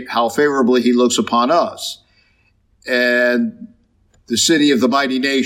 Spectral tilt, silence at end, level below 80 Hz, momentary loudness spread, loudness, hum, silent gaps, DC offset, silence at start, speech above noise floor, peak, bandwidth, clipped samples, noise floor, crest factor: -3 dB/octave; 0 s; -62 dBFS; 11 LU; -15 LUFS; none; none; under 0.1%; 0 s; 43 dB; -2 dBFS; 16.5 kHz; under 0.1%; -58 dBFS; 14 dB